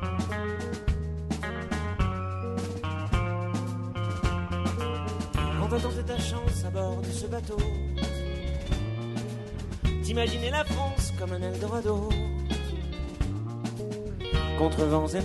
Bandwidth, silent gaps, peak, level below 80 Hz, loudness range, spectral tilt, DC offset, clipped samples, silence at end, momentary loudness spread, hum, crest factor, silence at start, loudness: 12 kHz; none; -10 dBFS; -34 dBFS; 2 LU; -6 dB/octave; under 0.1%; under 0.1%; 0 s; 6 LU; none; 18 dB; 0 s; -31 LUFS